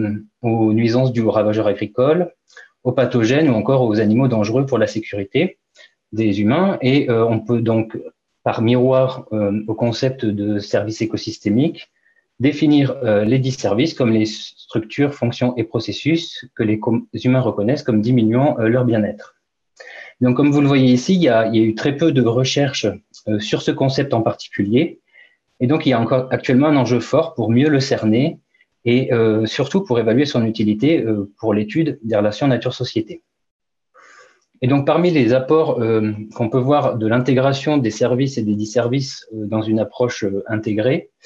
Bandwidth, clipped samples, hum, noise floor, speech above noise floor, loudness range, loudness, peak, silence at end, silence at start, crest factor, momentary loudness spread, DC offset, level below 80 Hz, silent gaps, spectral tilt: 7.8 kHz; under 0.1%; none; -52 dBFS; 35 dB; 3 LU; -18 LUFS; -4 dBFS; 0.25 s; 0 s; 12 dB; 9 LU; under 0.1%; -60 dBFS; 33.51-33.60 s; -7 dB/octave